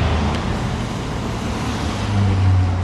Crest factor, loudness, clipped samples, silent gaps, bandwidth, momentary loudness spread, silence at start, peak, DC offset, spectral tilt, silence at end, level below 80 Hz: 12 dB; -21 LUFS; under 0.1%; none; 11.5 kHz; 8 LU; 0 s; -6 dBFS; under 0.1%; -6.5 dB/octave; 0 s; -28 dBFS